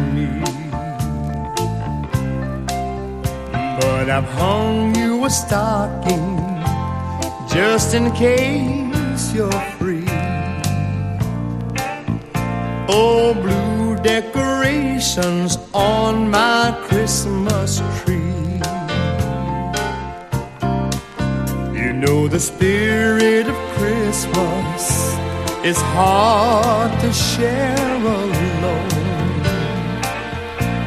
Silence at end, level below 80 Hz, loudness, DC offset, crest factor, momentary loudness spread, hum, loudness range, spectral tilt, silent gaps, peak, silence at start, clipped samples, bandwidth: 0 s; -34 dBFS; -18 LUFS; under 0.1%; 16 dB; 8 LU; none; 5 LU; -5 dB/octave; none; -2 dBFS; 0 s; under 0.1%; 15.5 kHz